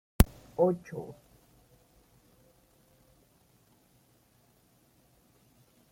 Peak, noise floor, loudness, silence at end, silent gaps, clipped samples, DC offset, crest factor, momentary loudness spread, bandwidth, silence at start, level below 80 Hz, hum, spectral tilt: -2 dBFS; -66 dBFS; -30 LUFS; 4.8 s; none; under 0.1%; under 0.1%; 34 dB; 20 LU; 16.5 kHz; 0.2 s; -40 dBFS; none; -6.5 dB/octave